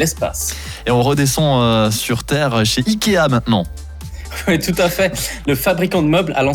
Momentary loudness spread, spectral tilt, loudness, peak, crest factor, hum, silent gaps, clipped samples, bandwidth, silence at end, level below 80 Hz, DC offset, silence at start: 9 LU; -4.5 dB/octave; -16 LUFS; -4 dBFS; 12 dB; none; none; under 0.1%; over 20 kHz; 0 s; -34 dBFS; under 0.1%; 0 s